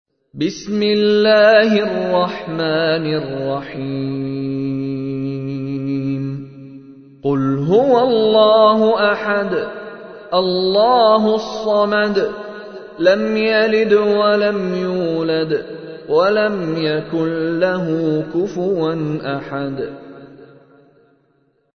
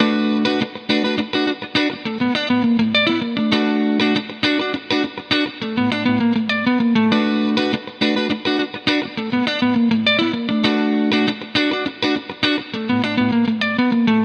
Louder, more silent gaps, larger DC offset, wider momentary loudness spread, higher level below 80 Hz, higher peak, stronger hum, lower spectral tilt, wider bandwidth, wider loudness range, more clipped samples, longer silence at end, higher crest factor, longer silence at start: about the same, -17 LUFS vs -18 LUFS; neither; neither; first, 12 LU vs 5 LU; about the same, -54 dBFS vs -58 dBFS; about the same, 0 dBFS vs 0 dBFS; neither; about the same, -6.5 dB/octave vs -5.5 dB/octave; second, 6.6 kHz vs 8.4 kHz; first, 8 LU vs 1 LU; neither; first, 1.3 s vs 0 s; about the same, 16 dB vs 18 dB; first, 0.35 s vs 0 s